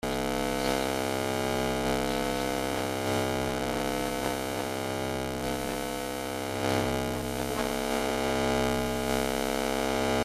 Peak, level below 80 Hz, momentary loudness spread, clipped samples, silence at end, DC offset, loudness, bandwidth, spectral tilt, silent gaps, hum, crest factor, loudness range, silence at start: -10 dBFS; -46 dBFS; 4 LU; under 0.1%; 0 s; under 0.1%; -30 LUFS; 16 kHz; -4 dB/octave; none; none; 18 dB; 2 LU; 0.05 s